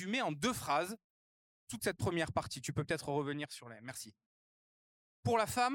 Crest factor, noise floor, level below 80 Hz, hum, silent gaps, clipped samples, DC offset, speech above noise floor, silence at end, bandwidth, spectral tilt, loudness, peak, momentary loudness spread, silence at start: 20 dB; under -90 dBFS; -66 dBFS; none; 1.04-1.67 s, 4.26-5.23 s; under 0.1%; under 0.1%; over 53 dB; 0 s; 16.5 kHz; -4.5 dB/octave; -37 LUFS; -18 dBFS; 14 LU; 0 s